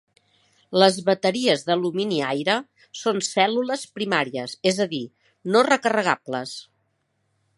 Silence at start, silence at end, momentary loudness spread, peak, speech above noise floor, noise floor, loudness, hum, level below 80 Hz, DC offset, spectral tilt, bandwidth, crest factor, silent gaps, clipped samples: 0.7 s; 0.95 s; 12 LU; -2 dBFS; 49 dB; -71 dBFS; -22 LUFS; none; -74 dBFS; under 0.1%; -4 dB/octave; 11.5 kHz; 22 dB; none; under 0.1%